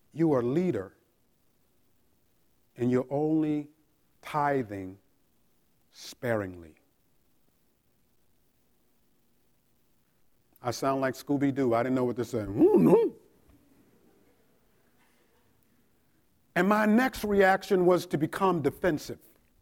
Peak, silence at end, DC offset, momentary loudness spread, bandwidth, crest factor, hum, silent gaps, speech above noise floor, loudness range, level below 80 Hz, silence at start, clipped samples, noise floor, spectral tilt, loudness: -10 dBFS; 0.45 s; under 0.1%; 16 LU; 17 kHz; 20 dB; none; none; 44 dB; 14 LU; -62 dBFS; 0.15 s; under 0.1%; -71 dBFS; -6.5 dB/octave; -27 LUFS